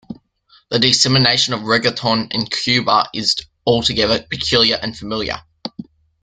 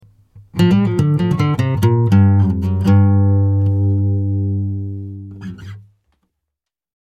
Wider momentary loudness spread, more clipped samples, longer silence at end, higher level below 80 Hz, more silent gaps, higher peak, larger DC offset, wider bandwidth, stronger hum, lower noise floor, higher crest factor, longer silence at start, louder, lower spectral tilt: second, 12 LU vs 19 LU; neither; second, 0.4 s vs 1.2 s; about the same, -46 dBFS vs -44 dBFS; neither; about the same, 0 dBFS vs -2 dBFS; neither; first, 9.6 kHz vs 8 kHz; neither; second, -54 dBFS vs -81 dBFS; about the same, 18 dB vs 14 dB; second, 0.1 s vs 0.35 s; about the same, -16 LUFS vs -15 LUFS; second, -3.5 dB/octave vs -9 dB/octave